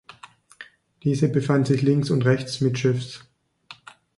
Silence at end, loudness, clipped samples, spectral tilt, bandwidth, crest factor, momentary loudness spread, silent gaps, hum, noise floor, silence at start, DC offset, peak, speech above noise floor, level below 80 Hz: 0.45 s; -22 LUFS; under 0.1%; -7 dB/octave; 11.5 kHz; 18 dB; 22 LU; none; none; -49 dBFS; 0.6 s; under 0.1%; -6 dBFS; 28 dB; -60 dBFS